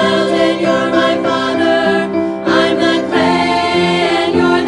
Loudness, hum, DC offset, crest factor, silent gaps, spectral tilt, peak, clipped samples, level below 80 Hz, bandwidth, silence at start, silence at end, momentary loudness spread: -13 LUFS; none; under 0.1%; 12 dB; none; -5 dB/octave; 0 dBFS; under 0.1%; -52 dBFS; 11 kHz; 0 s; 0 s; 2 LU